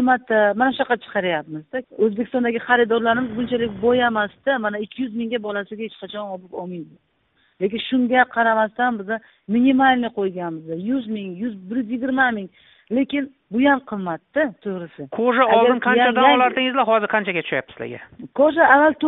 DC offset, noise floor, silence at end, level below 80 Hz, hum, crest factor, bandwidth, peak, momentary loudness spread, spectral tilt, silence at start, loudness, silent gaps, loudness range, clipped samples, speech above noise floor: under 0.1%; -64 dBFS; 0 s; -60 dBFS; none; 18 dB; 4.1 kHz; -2 dBFS; 16 LU; -2.5 dB/octave; 0 s; -20 LUFS; none; 7 LU; under 0.1%; 44 dB